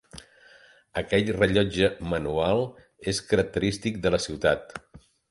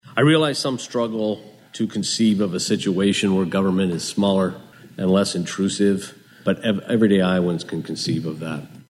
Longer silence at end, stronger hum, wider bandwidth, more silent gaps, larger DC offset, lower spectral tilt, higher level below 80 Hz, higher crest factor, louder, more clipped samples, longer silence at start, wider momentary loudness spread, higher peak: first, 0.35 s vs 0.1 s; neither; about the same, 11.5 kHz vs 12.5 kHz; neither; neither; about the same, -5 dB/octave vs -5.5 dB/octave; first, -46 dBFS vs -62 dBFS; first, 22 dB vs 16 dB; second, -26 LUFS vs -21 LUFS; neither; about the same, 0.15 s vs 0.05 s; about the same, 13 LU vs 11 LU; about the same, -4 dBFS vs -4 dBFS